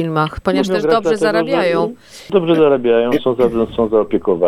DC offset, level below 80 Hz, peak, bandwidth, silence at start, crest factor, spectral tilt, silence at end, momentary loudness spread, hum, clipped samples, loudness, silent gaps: under 0.1%; -42 dBFS; -2 dBFS; 14 kHz; 0 s; 12 dB; -6.5 dB/octave; 0 s; 6 LU; none; under 0.1%; -15 LUFS; none